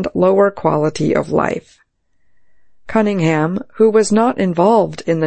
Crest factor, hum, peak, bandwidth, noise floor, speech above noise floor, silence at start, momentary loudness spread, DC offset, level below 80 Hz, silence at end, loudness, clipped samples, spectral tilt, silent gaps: 14 dB; none; -2 dBFS; 8.8 kHz; -62 dBFS; 48 dB; 0 s; 6 LU; under 0.1%; -50 dBFS; 0 s; -15 LUFS; under 0.1%; -6.5 dB/octave; none